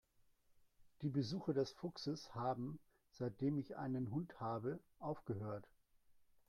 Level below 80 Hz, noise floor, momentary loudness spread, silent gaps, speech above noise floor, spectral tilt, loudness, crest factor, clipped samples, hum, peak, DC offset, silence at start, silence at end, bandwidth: -76 dBFS; -74 dBFS; 7 LU; none; 31 dB; -7.5 dB/octave; -44 LUFS; 18 dB; under 0.1%; none; -28 dBFS; under 0.1%; 0.8 s; 0.3 s; 13.5 kHz